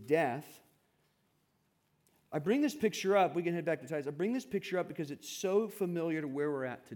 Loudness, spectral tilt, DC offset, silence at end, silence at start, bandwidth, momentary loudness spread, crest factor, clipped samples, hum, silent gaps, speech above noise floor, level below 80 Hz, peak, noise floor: -34 LUFS; -5.5 dB/octave; under 0.1%; 0 s; 0 s; 18 kHz; 10 LU; 18 dB; under 0.1%; none; none; 42 dB; -80 dBFS; -16 dBFS; -76 dBFS